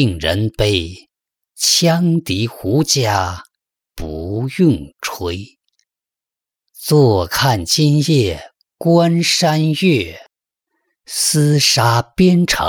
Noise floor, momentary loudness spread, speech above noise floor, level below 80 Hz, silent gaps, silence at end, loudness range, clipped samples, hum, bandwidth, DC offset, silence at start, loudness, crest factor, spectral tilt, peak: -87 dBFS; 13 LU; 72 dB; -42 dBFS; none; 0 s; 6 LU; under 0.1%; none; over 20 kHz; under 0.1%; 0 s; -15 LUFS; 14 dB; -4.5 dB/octave; -2 dBFS